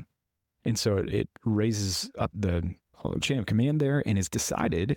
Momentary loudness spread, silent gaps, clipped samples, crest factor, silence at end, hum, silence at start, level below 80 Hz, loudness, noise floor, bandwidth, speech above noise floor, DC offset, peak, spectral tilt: 6 LU; none; under 0.1%; 14 dB; 0 s; none; 0 s; -48 dBFS; -28 LUFS; -82 dBFS; 17.5 kHz; 55 dB; under 0.1%; -14 dBFS; -5.5 dB/octave